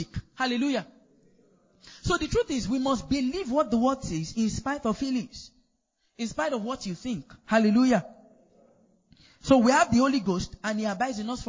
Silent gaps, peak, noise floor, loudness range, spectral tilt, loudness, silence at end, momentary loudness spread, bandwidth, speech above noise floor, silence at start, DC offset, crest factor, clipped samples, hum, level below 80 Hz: none; -6 dBFS; -74 dBFS; 5 LU; -5 dB/octave; -26 LUFS; 0 s; 13 LU; 7.6 kHz; 48 dB; 0 s; under 0.1%; 22 dB; under 0.1%; none; -48 dBFS